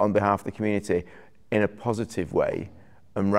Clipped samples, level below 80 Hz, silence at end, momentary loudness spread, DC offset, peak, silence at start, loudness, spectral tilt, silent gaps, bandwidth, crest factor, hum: under 0.1%; -56 dBFS; 0 s; 11 LU; 0.3%; -6 dBFS; 0 s; -27 LUFS; -7 dB/octave; none; 14.5 kHz; 20 dB; none